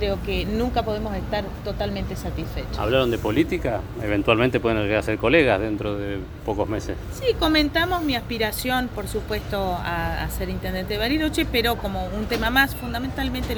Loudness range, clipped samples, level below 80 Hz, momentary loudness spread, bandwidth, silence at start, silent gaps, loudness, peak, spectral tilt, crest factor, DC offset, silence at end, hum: 4 LU; under 0.1%; -34 dBFS; 9 LU; over 20 kHz; 0 s; none; -23 LUFS; -2 dBFS; -5.5 dB/octave; 20 dB; under 0.1%; 0 s; none